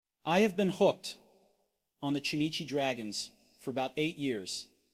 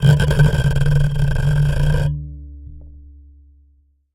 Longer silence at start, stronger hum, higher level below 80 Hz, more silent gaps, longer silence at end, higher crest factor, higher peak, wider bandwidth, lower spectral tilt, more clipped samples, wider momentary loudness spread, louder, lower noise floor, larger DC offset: first, 0.25 s vs 0 s; neither; second, -72 dBFS vs -24 dBFS; neither; second, 0.3 s vs 1.15 s; about the same, 20 dB vs 16 dB; second, -14 dBFS vs -2 dBFS; first, 16 kHz vs 12.5 kHz; second, -4.5 dB/octave vs -7 dB/octave; neither; second, 13 LU vs 22 LU; second, -33 LUFS vs -17 LUFS; first, -78 dBFS vs -56 dBFS; neither